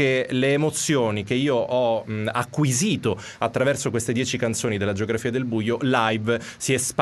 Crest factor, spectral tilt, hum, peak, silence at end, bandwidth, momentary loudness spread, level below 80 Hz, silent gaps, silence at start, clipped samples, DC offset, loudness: 18 dB; -4.5 dB/octave; none; -4 dBFS; 0 s; 12 kHz; 5 LU; -58 dBFS; none; 0 s; under 0.1%; under 0.1%; -23 LUFS